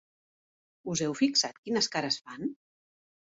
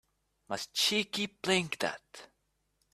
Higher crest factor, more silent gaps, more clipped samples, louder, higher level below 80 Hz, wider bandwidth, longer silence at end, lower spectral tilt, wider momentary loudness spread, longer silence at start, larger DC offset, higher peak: about the same, 20 dB vs 24 dB; first, 1.58-1.63 s vs none; neither; about the same, -30 LUFS vs -31 LUFS; about the same, -72 dBFS vs -72 dBFS; second, 8 kHz vs 15.5 kHz; about the same, 0.8 s vs 0.7 s; about the same, -3 dB/octave vs -2.5 dB/octave; second, 12 LU vs 19 LU; first, 0.85 s vs 0.5 s; neither; about the same, -14 dBFS vs -12 dBFS